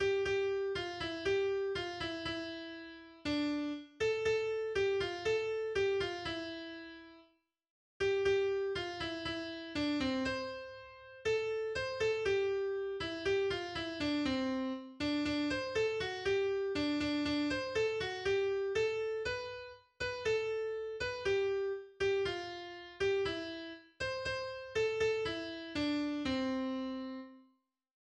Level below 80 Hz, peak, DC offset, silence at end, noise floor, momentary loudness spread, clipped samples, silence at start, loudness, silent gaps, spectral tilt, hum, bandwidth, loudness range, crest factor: -60 dBFS; -22 dBFS; under 0.1%; 0.65 s; -74 dBFS; 10 LU; under 0.1%; 0 s; -36 LUFS; 7.70-8.00 s; -4.5 dB/octave; none; 9.8 kHz; 3 LU; 14 dB